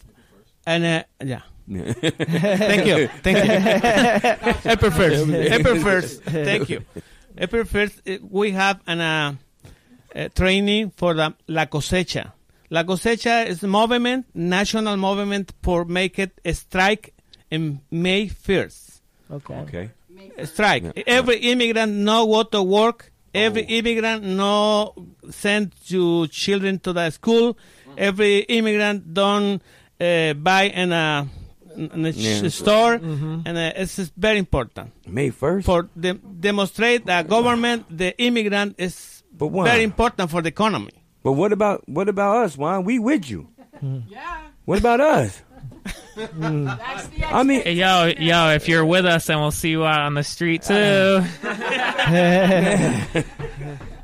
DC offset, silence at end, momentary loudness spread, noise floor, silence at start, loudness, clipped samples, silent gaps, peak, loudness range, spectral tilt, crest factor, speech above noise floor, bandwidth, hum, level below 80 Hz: under 0.1%; 0 s; 15 LU; -54 dBFS; 0.65 s; -20 LUFS; under 0.1%; none; -4 dBFS; 5 LU; -5 dB/octave; 16 dB; 35 dB; 15.5 kHz; none; -40 dBFS